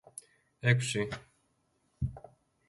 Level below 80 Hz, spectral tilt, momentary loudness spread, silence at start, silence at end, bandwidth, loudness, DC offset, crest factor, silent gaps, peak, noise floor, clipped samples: -54 dBFS; -5 dB/octave; 21 LU; 0.15 s; 0.5 s; 11.5 kHz; -32 LUFS; under 0.1%; 24 dB; none; -10 dBFS; -75 dBFS; under 0.1%